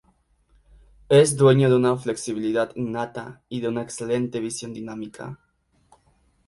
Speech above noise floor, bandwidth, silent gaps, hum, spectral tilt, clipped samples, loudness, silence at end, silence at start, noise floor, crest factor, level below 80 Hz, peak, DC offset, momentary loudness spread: 42 dB; 11.5 kHz; none; none; -6 dB/octave; under 0.1%; -22 LUFS; 1.15 s; 1.1 s; -64 dBFS; 20 dB; -58 dBFS; -2 dBFS; under 0.1%; 18 LU